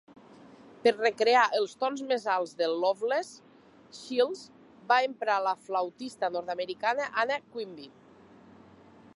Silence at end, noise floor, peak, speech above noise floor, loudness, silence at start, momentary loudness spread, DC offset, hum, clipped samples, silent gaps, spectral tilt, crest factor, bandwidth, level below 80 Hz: 1.3 s; -55 dBFS; -10 dBFS; 26 dB; -29 LUFS; 0.85 s; 15 LU; under 0.1%; none; under 0.1%; none; -3 dB/octave; 20 dB; 11.5 kHz; -78 dBFS